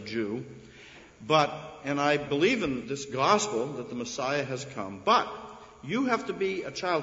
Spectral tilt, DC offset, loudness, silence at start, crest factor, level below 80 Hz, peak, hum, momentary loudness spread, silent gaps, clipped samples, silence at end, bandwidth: -4 dB/octave; under 0.1%; -28 LUFS; 0 s; 20 dB; -62 dBFS; -8 dBFS; none; 19 LU; none; under 0.1%; 0 s; 8 kHz